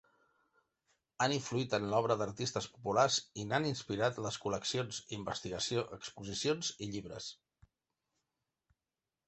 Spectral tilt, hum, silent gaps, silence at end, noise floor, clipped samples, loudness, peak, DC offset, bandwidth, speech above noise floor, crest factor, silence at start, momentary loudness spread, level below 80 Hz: -4 dB/octave; none; none; 1.95 s; under -90 dBFS; under 0.1%; -36 LUFS; -16 dBFS; under 0.1%; 8.4 kHz; over 54 dB; 22 dB; 1.2 s; 11 LU; -68 dBFS